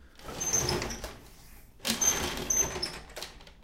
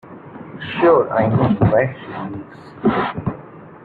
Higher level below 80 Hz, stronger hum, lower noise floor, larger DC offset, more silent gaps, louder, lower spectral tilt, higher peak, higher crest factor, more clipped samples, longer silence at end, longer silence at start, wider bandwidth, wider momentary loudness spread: about the same, -48 dBFS vs -46 dBFS; neither; first, -51 dBFS vs -38 dBFS; neither; neither; second, -29 LUFS vs -18 LUFS; second, -1.5 dB/octave vs -10.5 dB/octave; second, -12 dBFS vs -2 dBFS; first, 22 dB vs 16 dB; neither; about the same, 0 s vs 0 s; about the same, 0 s vs 0.05 s; first, 17 kHz vs 4.7 kHz; second, 17 LU vs 21 LU